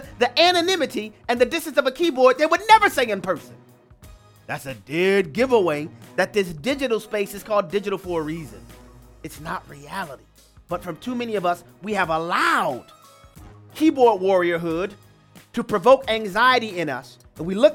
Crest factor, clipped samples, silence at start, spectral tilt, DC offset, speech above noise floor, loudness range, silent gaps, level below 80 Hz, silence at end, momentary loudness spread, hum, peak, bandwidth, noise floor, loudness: 20 dB; under 0.1%; 0 s; -4.5 dB/octave; under 0.1%; 29 dB; 9 LU; none; -52 dBFS; 0 s; 15 LU; none; 0 dBFS; 17.5 kHz; -50 dBFS; -21 LUFS